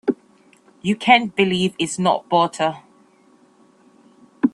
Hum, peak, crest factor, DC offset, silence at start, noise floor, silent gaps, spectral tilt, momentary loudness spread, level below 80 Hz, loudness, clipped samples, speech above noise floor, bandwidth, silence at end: none; 0 dBFS; 20 dB; under 0.1%; 0.05 s; -54 dBFS; none; -4.5 dB/octave; 12 LU; -62 dBFS; -19 LUFS; under 0.1%; 36 dB; 12 kHz; 0.05 s